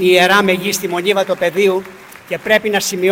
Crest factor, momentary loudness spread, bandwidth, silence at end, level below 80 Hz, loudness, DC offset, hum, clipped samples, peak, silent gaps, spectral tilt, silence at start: 14 dB; 13 LU; 17 kHz; 0 s; -58 dBFS; -14 LUFS; under 0.1%; none; under 0.1%; 0 dBFS; none; -3.5 dB/octave; 0 s